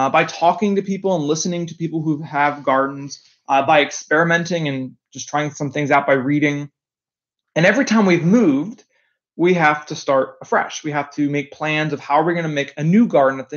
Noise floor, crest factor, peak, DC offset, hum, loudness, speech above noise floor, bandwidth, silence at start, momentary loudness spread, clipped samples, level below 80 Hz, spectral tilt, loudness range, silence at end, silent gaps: under -90 dBFS; 18 dB; 0 dBFS; under 0.1%; none; -18 LUFS; over 72 dB; 7.4 kHz; 0 s; 10 LU; under 0.1%; -70 dBFS; -5.5 dB/octave; 3 LU; 0 s; none